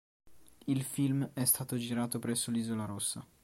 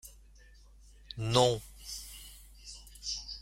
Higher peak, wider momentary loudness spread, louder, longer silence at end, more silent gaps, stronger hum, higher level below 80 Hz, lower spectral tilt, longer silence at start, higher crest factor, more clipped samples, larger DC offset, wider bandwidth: second, -16 dBFS vs -10 dBFS; second, 7 LU vs 23 LU; about the same, -33 LUFS vs -32 LUFS; first, 0.2 s vs 0 s; neither; neither; second, -70 dBFS vs -54 dBFS; about the same, -4.5 dB/octave vs -4 dB/octave; first, 0.25 s vs 0.05 s; second, 18 dB vs 26 dB; neither; neither; about the same, 16.5 kHz vs 16.5 kHz